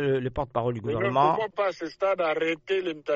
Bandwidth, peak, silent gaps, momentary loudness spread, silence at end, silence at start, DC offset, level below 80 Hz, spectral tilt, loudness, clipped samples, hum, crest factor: 7.6 kHz; -10 dBFS; none; 6 LU; 0 s; 0 s; under 0.1%; -52 dBFS; -4.5 dB/octave; -27 LUFS; under 0.1%; none; 16 dB